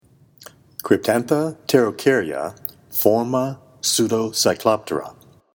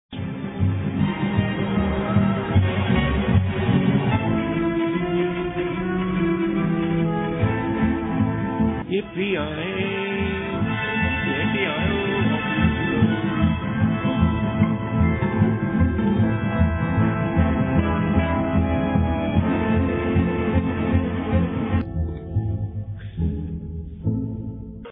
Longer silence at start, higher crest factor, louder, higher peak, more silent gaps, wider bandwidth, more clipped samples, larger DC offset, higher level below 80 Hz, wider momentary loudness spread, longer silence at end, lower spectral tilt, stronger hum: first, 0.4 s vs 0.1 s; about the same, 20 dB vs 16 dB; about the same, -20 LUFS vs -22 LUFS; first, 0 dBFS vs -4 dBFS; neither; first, over 20 kHz vs 4 kHz; neither; neither; second, -62 dBFS vs -34 dBFS; first, 11 LU vs 6 LU; first, 0.45 s vs 0 s; second, -4 dB/octave vs -11.5 dB/octave; neither